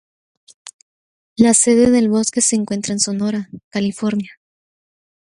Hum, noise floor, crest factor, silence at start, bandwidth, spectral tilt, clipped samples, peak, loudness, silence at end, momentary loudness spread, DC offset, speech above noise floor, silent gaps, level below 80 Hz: none; under -90 dBFS; 18 dB; 0.65 s; 11.5 kHz; -4 dB/octave; under 0.1%; 0 dBFS; -16 LUFS; 1.1 s; 14 LU; under 0.1%; over 74 dB; 0.73-1.36 s, 3.64-3.71 s; -54 dBFS